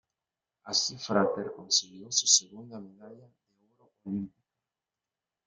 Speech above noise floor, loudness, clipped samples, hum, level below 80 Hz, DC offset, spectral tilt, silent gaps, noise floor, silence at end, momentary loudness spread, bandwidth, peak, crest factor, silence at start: over 59 dB; -27 LUFS; under 0.1%; none; -76 dBFS; under 0.1%; -1.5 dB/octave; none; under -90 dBFS; 1.2 s; 23 LU; 12 kHz; -8 dBFS; 26 dB; 0.65 s